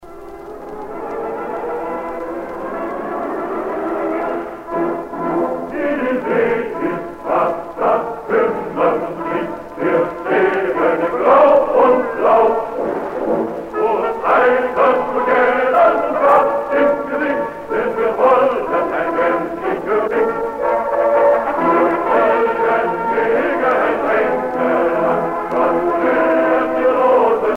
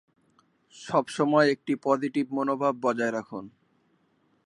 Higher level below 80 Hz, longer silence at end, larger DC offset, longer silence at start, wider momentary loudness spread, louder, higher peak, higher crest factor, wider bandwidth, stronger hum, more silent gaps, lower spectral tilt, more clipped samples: first, -50 dBFS vs -76 dBFS; second, 0 s vs 0.95 s; neither; second, 0 s vs 0.75 s; about the same, 11 LU vs 13 LU; first, -16 LUFS vs -26 LUFS; first, -2 dBFS vs -8 dBFS; second, 14 dB vs 20 dB; first, 15.5 kHz vs 11.5 kHz; neither; neither; first, -7 dB/octave vs -5.5 dB/octave; neither